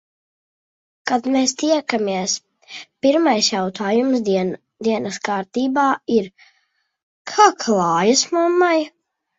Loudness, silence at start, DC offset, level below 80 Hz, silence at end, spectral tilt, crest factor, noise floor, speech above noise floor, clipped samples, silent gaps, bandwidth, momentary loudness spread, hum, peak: -18 LUFS; 1.05 s; under 0.1%; -66 dBFS; 0.5 s; -3.5 dB/octave; 20 dB; -67 dBFS; 49 dB; under 0.1%; 7.03-7.25 s; 8 kHz; 11 LU; none; 0 dBFS